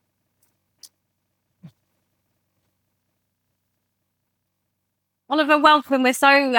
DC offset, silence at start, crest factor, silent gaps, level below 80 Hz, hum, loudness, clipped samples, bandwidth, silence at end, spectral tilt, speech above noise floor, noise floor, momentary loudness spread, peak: under 0.1%; 1.65 s; 20 dB; none; -76 dBFS; none; -17 LUFS; under 0.1%; 19 kHz; 0 s; -2 dB/octave; 61 dB; -77 dBFS; 8 LU; -4 dBFS